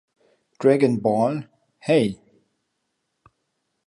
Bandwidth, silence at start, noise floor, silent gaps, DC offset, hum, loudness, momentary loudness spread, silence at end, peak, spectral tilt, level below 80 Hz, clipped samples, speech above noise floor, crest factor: 11.5 kHz; 0.6 s; -76 dBFS; none; under 0.1%; none; -21 LUFS; 15 LU; 1.75 s; -4 dBFS; -7 dB/octave; -64 dBFS; under 0.1%; 56 dB; 20 dB